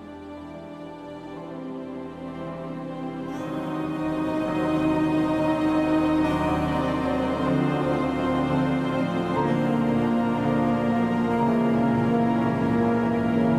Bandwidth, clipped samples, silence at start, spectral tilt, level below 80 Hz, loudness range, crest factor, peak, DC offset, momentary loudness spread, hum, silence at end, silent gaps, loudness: 12 kHz; under 0.1%; 0 s; -8 dB/octave; -46 dBFS; 10 LU; 14 dB; -10 dBFS; under 0.1%; 14 LU; none; 0 s; none; -24 LUFS